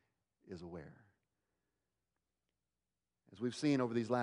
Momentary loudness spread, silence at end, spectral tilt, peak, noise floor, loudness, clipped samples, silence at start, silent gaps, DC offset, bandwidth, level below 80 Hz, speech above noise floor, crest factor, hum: 19 LU; 0 s; -6.5 dB/octave; -24 dBFS; under -90 dBFS; -38 LUFS; under 0.1%; 0.5 s; none; under 0.1%; 11 kHz; -78 dBFS; over 53 dB; 20 dB; none